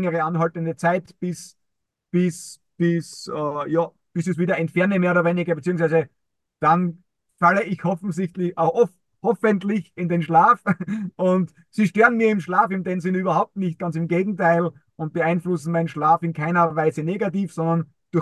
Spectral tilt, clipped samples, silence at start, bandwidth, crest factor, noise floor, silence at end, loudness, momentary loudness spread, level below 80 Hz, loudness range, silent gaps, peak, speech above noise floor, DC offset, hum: -7.5 dB/octave; under 0.1%; 0 s; 12 kHz; 18 dB; -78 dBFS; 0 s; -22 LUFS; 9 LU; -68 dBFS; 5 LU; none; -4 dBFS; 57 dB; under 0.1%; none